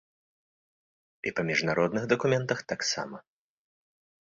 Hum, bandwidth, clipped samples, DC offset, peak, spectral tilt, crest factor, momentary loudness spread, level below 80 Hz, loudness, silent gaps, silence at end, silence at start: none; 7.8 kHz; under 0.1%; under 0.1%; -8 dBFS; -4.5 dB/octave; 22 dB; 10 LU; -68 dBFS; -28 LUFS; none; 1.05 s; 1.25 s